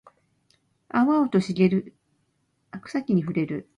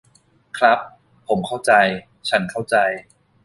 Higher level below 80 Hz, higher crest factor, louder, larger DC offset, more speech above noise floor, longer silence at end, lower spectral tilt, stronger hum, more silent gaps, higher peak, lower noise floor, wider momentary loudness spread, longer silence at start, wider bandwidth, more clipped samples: second, -66 dBFS vs -58 dBFS; about the same, 18 dB vs 18 dB; second, -24 LUFS vs -19 LUFS; neither; first, 48 dB vs 39 dB; second, 0.15 s vs 0.45 s; first, -8 dB/octave vs -4 dB/octave; neither; neither; second, -8 dBFS vs -2 dBFS; first, -71 dBFS vs -57 dBFS; second, 11 LU vs 14 LU; first, 0.95 s vs 0.55 s; about the same, 10.5 kHz vs 11.5 kHz; neither